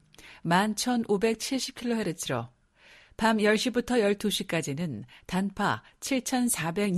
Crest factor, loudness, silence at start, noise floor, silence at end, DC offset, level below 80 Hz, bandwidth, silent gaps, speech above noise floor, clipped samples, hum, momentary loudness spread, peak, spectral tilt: 18 dB; -28 LUFS; 0.2 s; -57 dBFS; 0 s; under 0.1%; -58 dBFS; 14.5 kHz; none; 30 dB; under 0.1%; none; 9 LU; -10 dBFS; -4 dB/octave